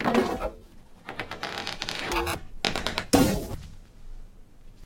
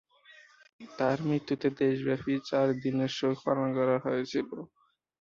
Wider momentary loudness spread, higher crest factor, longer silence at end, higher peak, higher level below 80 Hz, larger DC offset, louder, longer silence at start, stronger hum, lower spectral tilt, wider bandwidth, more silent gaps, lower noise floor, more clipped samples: first, 17 LU vs 6 LU; first, 26 dB vs 18 dB; second, 0 s vs 0.55 s; first, -4 dBFS vs -12 dBFS; first, -42 dBFS vs -70 dBFS; neither; about the same, -28 LUFS vs -30 LUFS; second, 0 s vs 0.8 s; neither; second, -4 dB/octave vs -7 dB/octave; first, 17 kHz vs 7.4 kHz; neither; second, -48 dBFS vs -58 dBFS; neither